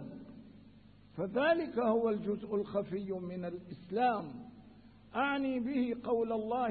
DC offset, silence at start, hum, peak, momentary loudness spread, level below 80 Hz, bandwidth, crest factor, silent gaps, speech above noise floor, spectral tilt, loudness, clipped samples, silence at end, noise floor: under 0.1%; 0 s; 50 Hz at -65 dBFS; -18 dBFS; 18 LU; -68 dBFS; 4.6 kHz; 16 dB; none; 25 dB; -5 dB/octave; -34 LUFS; under 0.1%; 0 s; -59 dBFS